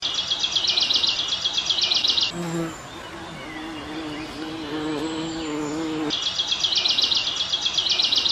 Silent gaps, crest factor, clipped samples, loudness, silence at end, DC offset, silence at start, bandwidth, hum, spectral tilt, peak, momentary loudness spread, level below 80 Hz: none; 16 dB; under 0.1%; -21 LUFS; 0 s; under 0.1%; 0 s; 14 kHz; none; -2 dB/octave; -8 dBFS; 15 LU; -54 dBFS